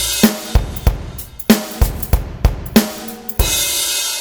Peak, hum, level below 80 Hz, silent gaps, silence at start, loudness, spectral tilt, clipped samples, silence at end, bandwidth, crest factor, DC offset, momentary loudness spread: 0 dBFS; none; -22 dBFS; none; 0 s; -17 LUFS; -3.5 dB/octave; under 0.1%; 0 s; over 20 kHz; 16 dB; under 0.1%; 10 LU